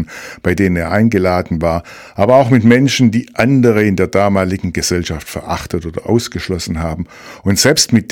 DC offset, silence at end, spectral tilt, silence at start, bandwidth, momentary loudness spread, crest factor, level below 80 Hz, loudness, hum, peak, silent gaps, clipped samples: under 0.1%; 0.1 s; -5 dB/octave; 0 s; 18 kHz; 12 LU; 14 dB; -36 dBFS; -14 LUFS; none; 0 dBFS; none; 0.3%